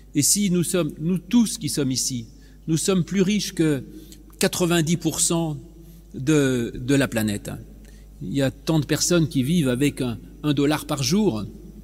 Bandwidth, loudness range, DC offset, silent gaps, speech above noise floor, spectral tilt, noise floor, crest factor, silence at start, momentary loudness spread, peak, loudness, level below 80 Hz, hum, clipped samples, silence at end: 16 kHz; 2 LU; under 0.1%; none; 20 dB; -4.5 dB/octave; -42 dBFS; 18 dB; 0.15 s; 11 LU; -4 dBFS; -22 LUFS; -46 dBFS; none; under 0.1%; 0 s